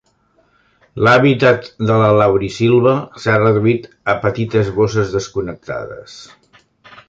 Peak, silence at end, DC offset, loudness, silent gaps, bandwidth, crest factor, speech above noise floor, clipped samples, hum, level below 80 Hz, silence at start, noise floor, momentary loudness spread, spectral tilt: 0 dBFS; 0.85 s; under 0.1%; -15 LUFS; none; 7.8 kHz; 16 dB; 43 dB; under 0.1%; none; -46 dBFS; 0.95 s; -58 dBFS; 15 LU; -7 dB/octave